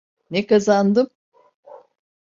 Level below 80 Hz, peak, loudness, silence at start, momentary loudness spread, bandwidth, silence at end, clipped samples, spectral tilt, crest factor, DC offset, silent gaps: -64 dBFS; -4 dBFS; -19 LUFS; 0.3 s; 10 LU; 7.6 kHz; 0.5 s; under 0.1%; -6 dB/octave; 16 dB; under 0.1%; 1.15-1.32 s, 1.54-1.63 s